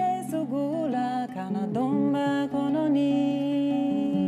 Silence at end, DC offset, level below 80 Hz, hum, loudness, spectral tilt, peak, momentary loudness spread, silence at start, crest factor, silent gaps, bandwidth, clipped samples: 0 s; under 0.1%; -70 dBFS; none; -26 LUFS; -7.5 dB/octave; -14 dBFS; 6 LU; 0 s; 12 dB; none; 12.5 kHz; under 0.1%